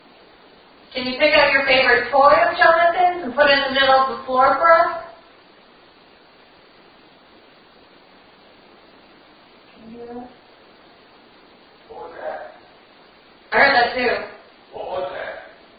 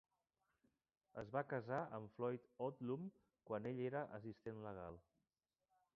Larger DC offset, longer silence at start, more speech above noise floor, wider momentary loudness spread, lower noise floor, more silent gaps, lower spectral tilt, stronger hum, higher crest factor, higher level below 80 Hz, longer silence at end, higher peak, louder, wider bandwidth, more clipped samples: neither; second, 0.9 s vs 1.15 s; second, 34 dB vs over 42 dB; first, 22 LU vs 11 LU; second, -50 dBFS vs under -90 dBFS; neither; about the same, -7.5 dB/octave vs -7 dB/octave; neither; about the same, 20 dB vs 22 dB; first, -54 dBFS vs -78 dBFS; second, 0.3 s vs 0.95 s; first, 0 dBFS vs -28 dBFS; first, -16 LUFS vs -48 LUFS; second, 5 kHz vs 6 kHz; neither